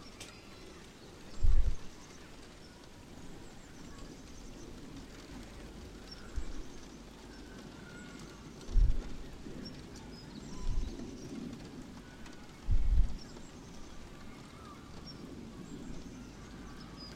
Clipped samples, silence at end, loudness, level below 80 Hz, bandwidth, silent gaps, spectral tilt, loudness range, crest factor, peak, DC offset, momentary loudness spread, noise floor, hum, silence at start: under 0.1%; 0 s; -44 LUFS; -38 dBFS; 9.6 kHz; none; -5.5 dB/octave; 9 LU; 22 dB; -14 dBFS; under 0.1%; 16 LU; -52 dBFS; none; 0 s